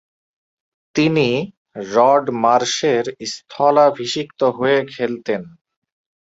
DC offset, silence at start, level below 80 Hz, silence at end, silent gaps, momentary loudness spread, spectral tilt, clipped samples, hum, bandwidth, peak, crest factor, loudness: under 0.1%; 0.95 s; -62 dBFS; 0.8 s; 1.57-1.65 s; 12 LU; -4.5 dB/octave; under 0.1%; none; 8 kHz; -2 dBFS; 18 dB; -18 LUFS